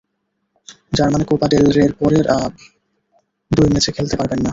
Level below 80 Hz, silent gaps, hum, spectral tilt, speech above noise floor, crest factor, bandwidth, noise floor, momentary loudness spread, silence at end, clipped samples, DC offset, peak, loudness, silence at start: -38 dBFS; none; none; -6 dB/octave; 56 dB; 16 dB; 8 kHz; -71 dBFS; 7 LU; 0 s; under 0.1%; under 0.1%; -2 dBFS; -16 LUFS; 0.7 s